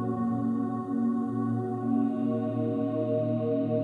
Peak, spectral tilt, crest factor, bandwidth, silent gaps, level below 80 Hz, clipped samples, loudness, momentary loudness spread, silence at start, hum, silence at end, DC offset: -16 dBFS; -11 dB/octave; 12 dB; 4 kHz; none; -74 dBFS; under 0.1%; -29 LUFS; 2 LU; 0 s; none; 0 s; under 0.1%